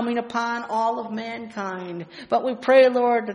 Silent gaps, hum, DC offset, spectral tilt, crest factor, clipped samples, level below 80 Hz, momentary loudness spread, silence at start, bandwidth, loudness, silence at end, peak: none; none; under 0.1%; -5.5 dB/octave; 18 dB; under 0.1%; -70 dBFS; 16 LU; 0 s; 10 kHz; -22 LUFS; 0 s; -4 dBFS